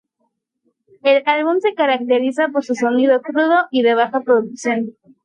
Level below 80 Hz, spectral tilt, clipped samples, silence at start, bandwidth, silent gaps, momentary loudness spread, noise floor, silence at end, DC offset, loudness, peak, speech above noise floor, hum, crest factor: -74 dBFS; -4.5 dB/octave; under 0.1%; 1.05 s; 9.8 kHz; none; 6 LU; -70 dBFS; 0.35 s; under 0.1%; -17 LUFS; -2 dBFS; 54 dB; none; 14 dB